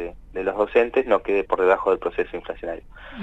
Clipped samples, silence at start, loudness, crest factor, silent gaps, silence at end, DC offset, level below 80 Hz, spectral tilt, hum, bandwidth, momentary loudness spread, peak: under 0.1%; 0 s; -22 LUFS; 18 dB; none; 0 s; under 0.1%; -46 dBFS; -6.5 dB/octave; none; 7.8 kHz; 14 LU; -4 dBFS